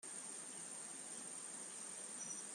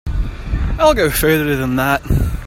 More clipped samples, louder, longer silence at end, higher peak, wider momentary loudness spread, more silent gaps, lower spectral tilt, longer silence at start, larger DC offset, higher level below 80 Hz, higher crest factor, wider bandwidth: neither; second, -47 LUFS vs -16 LUFS; about the same, 0 s vs 0 s; second, -36 dBFS vs 0 dBFS; second, 2 LU vs 10 LU; neither; second, -0.5 dB/octave vs -5.5 dB/octave; about the same, 0 s vs 0.05 s; neither; second, under -90 dBFS vs -22 dBFS; about the same, 16 dB vs 14 dB; about the same, 15 kHz vs 16.5 kHz